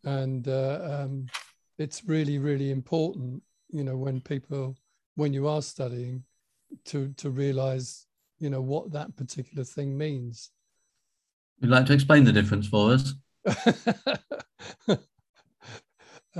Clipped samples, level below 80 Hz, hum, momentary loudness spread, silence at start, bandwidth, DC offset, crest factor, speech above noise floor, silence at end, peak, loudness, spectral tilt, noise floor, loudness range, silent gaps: under 0.1%; -56 dBFS; none; 18 LU; 0.05 s; 12 kHz; under 0.1%; 24 dB; 52 dB; 0 s; -4 dBFS; -27 LUFS; -6.5 dB/octave; -78 dBFS; 10 LU; 5.06-5.16 s, 11.33-11.56 s, 15.29-15.34 s